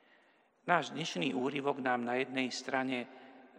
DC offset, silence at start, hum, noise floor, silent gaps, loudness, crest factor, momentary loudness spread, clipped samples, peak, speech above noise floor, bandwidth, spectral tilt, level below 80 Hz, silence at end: under 0.1%; 0.65 s; none; -68 dBFS; none; -34 LUFS; 24 dB; 9 LU; under 0.1%; -12 dBFS; 34 dB; 10.5 kHz; -4.5 dB/octave; under -90 dBFS; 0.1 s